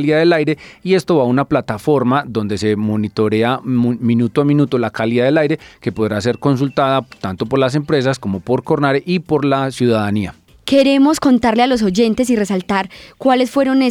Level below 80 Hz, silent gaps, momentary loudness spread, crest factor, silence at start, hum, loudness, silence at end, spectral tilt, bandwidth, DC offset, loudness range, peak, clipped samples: -48 dBFS; none; 7 LU; 12 dB; 0 s; none; -16 LUFS; 0 s; -6.5 dB/octave; 14 kHz; under 0.1%; 2 LU; -2 dBFS; under 0.1%